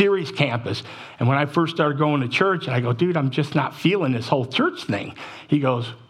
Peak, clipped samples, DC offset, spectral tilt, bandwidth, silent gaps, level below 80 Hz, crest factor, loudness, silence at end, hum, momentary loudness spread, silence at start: -4 dBFS; under 0.1%; under 0.1%; -7 dB/octave; 12.5 kHz; none; -68 dBFS; 18 dB; -22 LUFS; 0.15 s; none; 8 LU; 0 s